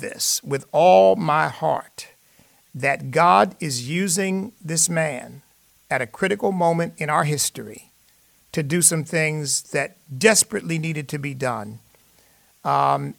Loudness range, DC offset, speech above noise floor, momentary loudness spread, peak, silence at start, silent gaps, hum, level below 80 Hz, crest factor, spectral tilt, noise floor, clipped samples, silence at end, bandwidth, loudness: 4 LU; under 0.1%; 37 dB; 14 LU; 0 dBFS; 0 s; none; none; -64 dBFS; 20 dB; -3.5 dB/octave; -58 dBFS; under 0.1%; 0.05 s; 19 kHz; -20 LUFS